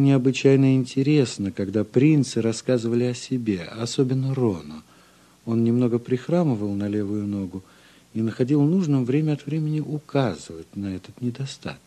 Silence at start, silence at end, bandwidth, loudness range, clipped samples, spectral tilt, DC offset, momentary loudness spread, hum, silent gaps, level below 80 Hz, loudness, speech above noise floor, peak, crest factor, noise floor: 0 s; 0.1 s; 11 kHz; 4 LU; under 0.1%; -7 dB/octave; under 0.1%; 14 LU; none; none; -56 dBFS; -23 LUFS; 32 dB; -4 dBFS; 18 dB; -54 dBFS